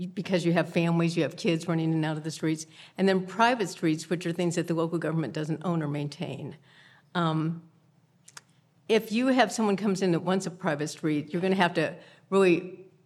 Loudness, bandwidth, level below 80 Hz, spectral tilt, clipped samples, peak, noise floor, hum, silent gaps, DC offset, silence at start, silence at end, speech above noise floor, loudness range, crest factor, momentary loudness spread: -27 LUFS; 13.5 kHz; -82 dBFS; -6 dB/octave; under 0.1%; -6 dBFS; -63 dBFS; none; none; under 0.1%; 0 s; 0.25 s; 36 dB; 5 LU; 22 dB; 9 LU